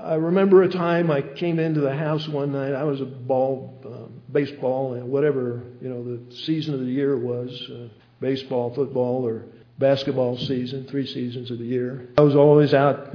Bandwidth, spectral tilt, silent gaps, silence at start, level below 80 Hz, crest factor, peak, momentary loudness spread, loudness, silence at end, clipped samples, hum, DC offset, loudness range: 5.4 kHz; -8.5 dB/octave; none; 0 s; -64 dBFS; 20 dB; -2 dBFS; 16 LU; -22 LUFS; 0 s; under 0.1%; none; under 0.1%; 5 LU